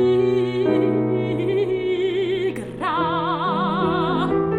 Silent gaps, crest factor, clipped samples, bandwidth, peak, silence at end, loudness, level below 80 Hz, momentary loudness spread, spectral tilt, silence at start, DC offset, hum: none; 12 dB; under 0.1%; 10 kHz; -8 dBFS; 0 s; -21 LUFS; -50 dBFS; 4 LU; -8 dB/octave; 0 s; under 0.1%; none